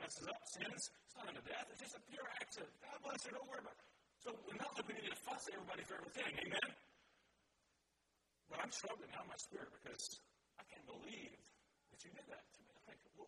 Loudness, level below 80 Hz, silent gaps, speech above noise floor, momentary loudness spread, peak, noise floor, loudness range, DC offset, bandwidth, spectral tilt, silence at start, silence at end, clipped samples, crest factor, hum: -50 LUFS; -84 dBFS; none; 32 dB; 16 LU; -26 dBFS; -84 dBFS; 7 LU; under 0.1%; 12 kHz; -2 dB/octave; 0 s; 0 s; under 0.1%; 28 dB; none